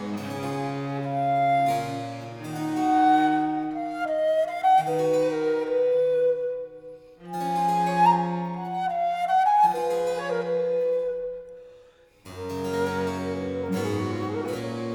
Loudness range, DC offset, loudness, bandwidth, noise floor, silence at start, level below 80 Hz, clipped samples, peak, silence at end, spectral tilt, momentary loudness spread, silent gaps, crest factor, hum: 6 LU; under 0.1%; -25 LUFS; 18 kHz; -54 dBFS; 0 s; -64 dBFS; under 0.1%; -8 dBFS; 0 s; -6.5 dB/octave; 14 LU; none; 16 dB; none